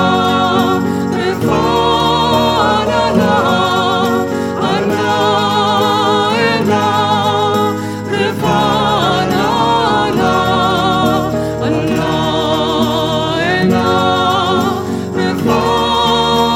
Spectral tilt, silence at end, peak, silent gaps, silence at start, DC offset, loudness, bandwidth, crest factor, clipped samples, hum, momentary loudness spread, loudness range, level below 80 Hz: -5 dB/octave; 0 s; 0 dBFS; none; 0 s; under 0.1%; -13 LUFS; 17 kHz; 12 dB; under 0.1%; none; 4 LU; 1 LU; -38 dBFS